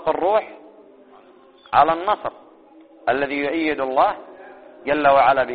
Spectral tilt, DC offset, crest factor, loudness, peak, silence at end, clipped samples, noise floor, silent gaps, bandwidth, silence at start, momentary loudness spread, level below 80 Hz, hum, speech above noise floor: -2.5 dB/octave; under 0.1%; 20 dB; -19 LUFS; 0 dBFS; 0 s; under 0.1%; -49 dBFS; none; 4.8 kHz; 0 s; 17 LU; -56 dBFS; none; 31 dB